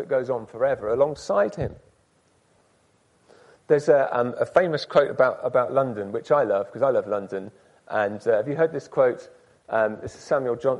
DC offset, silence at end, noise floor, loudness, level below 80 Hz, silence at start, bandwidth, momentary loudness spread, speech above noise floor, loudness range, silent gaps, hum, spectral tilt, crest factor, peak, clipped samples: under 0.1%; 0 s; -63 dBFS; -23 LUFS; -58 dBFS; 0 s; 11 kHz; 10 LU; 40 dB; 5 LU; none; none; -6.5 dB/octave; 18 dB; -6 dBFS; under 0.1%